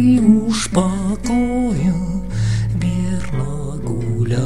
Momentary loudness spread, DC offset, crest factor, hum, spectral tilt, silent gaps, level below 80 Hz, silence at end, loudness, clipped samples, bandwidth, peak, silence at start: 9 LU; 3%; 16 dB; none; -6.5 dB/octave; none; -32 dBFS; 0 s; -18 LUFS; under 0.1%; 12 kHz; -2 dBFS; 0 s